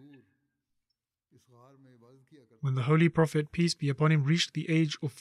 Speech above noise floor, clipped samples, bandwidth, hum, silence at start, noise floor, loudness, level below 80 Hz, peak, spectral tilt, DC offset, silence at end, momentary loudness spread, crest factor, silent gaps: 57 dB; under 0.1%; 11.5 kHz; none; 2.65 s; -86 dBFS; -28 LUFS; -68 dBFS; -12 dBFS; -6 dB/octave; under 0.1%; 0 s; 7 LU; 18 dB; none